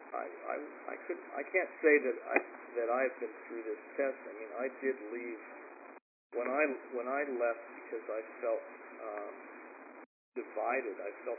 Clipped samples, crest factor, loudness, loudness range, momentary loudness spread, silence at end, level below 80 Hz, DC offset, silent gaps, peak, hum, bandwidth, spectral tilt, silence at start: under 0.1%; 26 dB; -36 LUFS; 7 LU; 17 LU; 0 s; under -90 dBFS; under 0.1%; 6.02-6.30 s, 10.06-10.32 s; -10 dBFS; none; 2.7 kHz; -5 dB/octave; 0 s